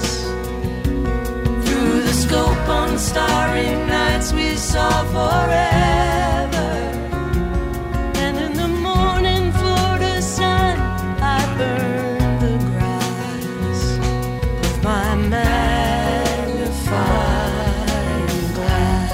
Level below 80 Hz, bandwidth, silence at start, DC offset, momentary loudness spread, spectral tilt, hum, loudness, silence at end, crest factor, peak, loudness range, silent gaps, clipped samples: -24 dBFS; 16.5 kHz; 0 s; under 0.1%; 6 LU; -5 dB/octave; none; -19 LUFS; 0 s; 16 dB; -2 dBFS; 3 LU; none; under 0.1%